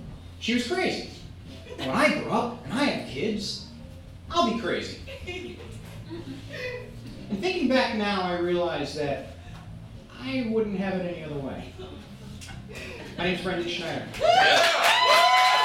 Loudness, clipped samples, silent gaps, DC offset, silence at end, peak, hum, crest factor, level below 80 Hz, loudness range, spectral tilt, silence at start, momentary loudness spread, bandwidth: -25 LUFS; under 0.1%; none; under 0.1%; 0 s; -6 dBFS; none; 20 dB; -50 dBFS; 9 LU; -4 dB/octave; 0 s; 24 LU; 17 kHz